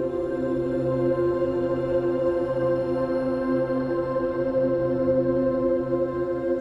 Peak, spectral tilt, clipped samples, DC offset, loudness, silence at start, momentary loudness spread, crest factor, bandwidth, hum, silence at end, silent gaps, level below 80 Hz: -12 dBFS; -9.5 dB/octave; under 0.1%; under 0.1%; -25 LUFS; 0 s; 3 LU; 12 dB; 5.6 kHz; none; 0 s; none; -48 dBFS